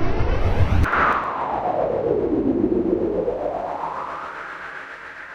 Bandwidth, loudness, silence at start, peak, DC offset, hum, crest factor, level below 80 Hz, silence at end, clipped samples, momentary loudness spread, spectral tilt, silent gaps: 8.8 kHz; -22 LUFS; 0 s; -4 dBFS; under 0.1%; none; 16 dB; -30 dBFS; 0 s; under 0.1%; 13 LU; -8 dB/octave; none